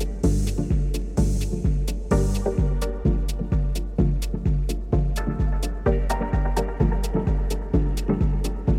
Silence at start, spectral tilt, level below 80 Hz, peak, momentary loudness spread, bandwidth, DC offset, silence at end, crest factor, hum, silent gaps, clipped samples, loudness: 0 s; -7 dB/octave; -24 dBFS; -6 dBFS; 3 LU; 14.5 kHz; under 0.1%; 0 s; 14 dB; none; none; under 0.1%; -25 LUFS